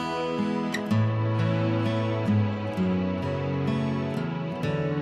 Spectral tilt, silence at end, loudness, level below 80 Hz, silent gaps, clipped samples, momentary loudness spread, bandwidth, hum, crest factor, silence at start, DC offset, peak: -8 dB/octave; 0 s; -27 LUFS; -58 dBFS; none; under 0.1%; 4 LU; 10 kHz; none; 12 dB; 0 s; under 0.1%; -14 dBFS